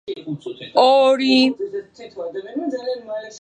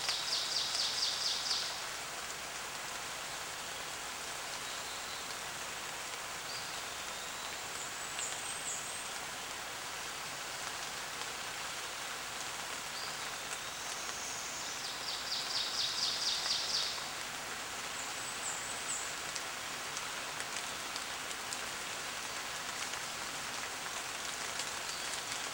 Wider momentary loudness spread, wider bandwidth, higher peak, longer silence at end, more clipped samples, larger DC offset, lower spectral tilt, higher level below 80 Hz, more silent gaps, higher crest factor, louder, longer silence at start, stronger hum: first, 17 LU vs 8 LU; second, 9.6 kHz vs over 20 kHz; first, -2 dBFS vs -16 dBFS; about the same, 0.05 s vs 0 s; neither; neither; first, -4.5 dB/octave vs 0.5 dB/octave; about the same, -70 dBFS vs -68 dBFS; neither; second, 18 dB vs 24 dB; first, -18 LUFS vs -37 LUFS; about the same, 0.05 s vs 0 s; neither